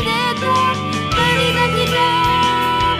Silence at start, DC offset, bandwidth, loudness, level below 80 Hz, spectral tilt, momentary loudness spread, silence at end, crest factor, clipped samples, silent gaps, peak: 0 s; under 0.1%; 15.5 kHz; -15 LUFS; -36 dBFS; -4 dB/octave; 3 LU; 0 s; 14 dB; under 0.1%; none; -2 dBFS